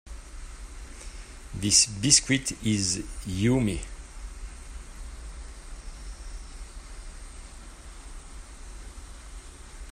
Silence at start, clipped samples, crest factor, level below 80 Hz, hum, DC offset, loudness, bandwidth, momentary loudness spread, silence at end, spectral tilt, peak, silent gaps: 0.05 s; under 0.1%; 26 dB; -42 dBFS; none; under 0.1%; -23 LUFS; 16 kHz; 26 LU; 0 s; -2.5 dB/octave; -4 dBFS; none